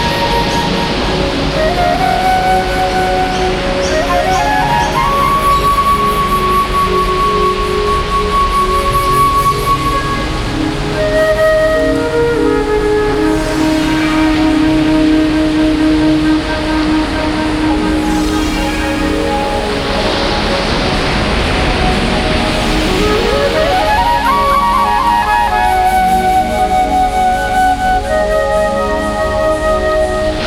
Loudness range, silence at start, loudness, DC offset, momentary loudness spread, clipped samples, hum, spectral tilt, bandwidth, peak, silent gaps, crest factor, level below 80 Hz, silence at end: 2 LU; 0 s; -12 LUFS; under 0.1%; 4 LU; under 0.1%; none; -5 dB/octave; 17 kHz; 0 dBFS; none; 12 dB; -22 dBFS; 0 s